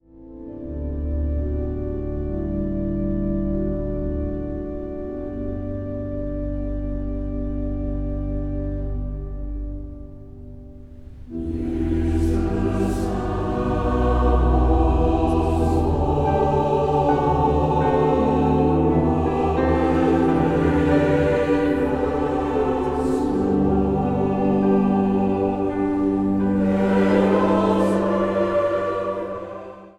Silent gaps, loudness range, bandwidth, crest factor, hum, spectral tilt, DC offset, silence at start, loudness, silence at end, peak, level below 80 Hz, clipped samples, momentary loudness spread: none; 9 LU; 11 kHz; 16 dB; none; -8.5 dB/octave; under 0.1%; 0.15 s; -22 LUFS; 0.1 s; -4 dBFS; -28 dBFS; under 0.1%; 12 LU